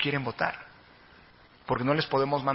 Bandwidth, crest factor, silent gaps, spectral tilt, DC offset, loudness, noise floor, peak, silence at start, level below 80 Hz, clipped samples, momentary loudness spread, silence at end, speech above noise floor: 5.8 kHz; 20 dB; none; -9.5 dB/octave; under 0.1%; -28 LUFS; -56 dBFS; -10 dBFS; 0 s; -60 dBFS; under 0.1%; 19 LU; 0 s; 28 dB